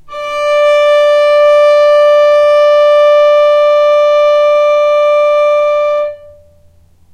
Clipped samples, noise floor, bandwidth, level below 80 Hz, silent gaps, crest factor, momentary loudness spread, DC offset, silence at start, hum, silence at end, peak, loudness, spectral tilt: under 0.1%; -44 dBFS; 9.2 kHz; -50 dBFS; none; 8 dB; 5 LU; under 0.1%; 0.05 s; none; 0.95 s; -2 dBFS; -8 LUFS; -1 dB/octave